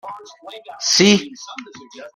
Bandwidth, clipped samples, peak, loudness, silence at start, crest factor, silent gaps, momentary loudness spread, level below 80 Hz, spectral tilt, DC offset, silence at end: 14.5 kHz; under 0.1%; -2 dBFS; -15 LUFS; 0.05 s; 20 dB; none; 25 LU; -62 dBFS; -3 dB/octave; under 0.1%; 0.1 s